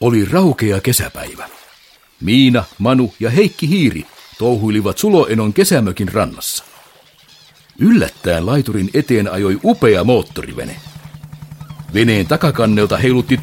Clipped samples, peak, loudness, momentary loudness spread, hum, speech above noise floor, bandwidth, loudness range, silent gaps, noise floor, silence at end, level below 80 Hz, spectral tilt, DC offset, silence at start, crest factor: under 0.1%; 0 dBFS; -14 LUFS; 18 LU; none; 34 dB; 17 kHz; 2 LU; none; -48 dBFS; 0 s; -42 dBFS; -5.5 dB/octave; under 0.1%; 0 s; 14 dB